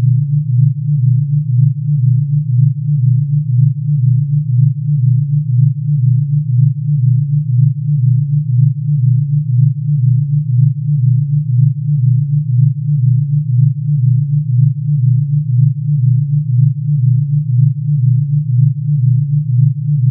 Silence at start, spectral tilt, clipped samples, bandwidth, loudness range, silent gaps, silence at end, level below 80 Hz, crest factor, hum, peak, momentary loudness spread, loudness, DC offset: 0 s; -23 dB/octave; under 0.1%; 0.3 kHz; 0 LU; none; 0 s; -52 dBFS; 10 dB; none; -2 dBFS; 2 LU; -13 LUFS; under 0.1%